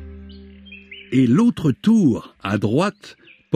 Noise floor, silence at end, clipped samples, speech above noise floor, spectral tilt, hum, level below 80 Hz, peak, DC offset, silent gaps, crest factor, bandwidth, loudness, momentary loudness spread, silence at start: -42 dBFS; 0 s; under 0.1%; 24 dB; -7.5 dB/octave; none; -48 dBFS; -4 dBFS; under 0.1%; none; 16 dB; 11 kHz; -19 LUFS; 23 LU; 0 s